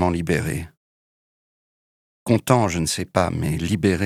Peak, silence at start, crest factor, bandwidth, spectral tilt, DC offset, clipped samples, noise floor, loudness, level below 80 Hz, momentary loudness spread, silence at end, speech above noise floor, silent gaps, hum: 0 dBFS; 0 s; 22 dB; 16 kHz; -5.5 dB/octave; under 0.1%; under 0.1%; under -90 dBFS; -22 LUFS; -42 dBFS; 11 LU; 0 s; over 69 dB; 0.77-2.26 s; none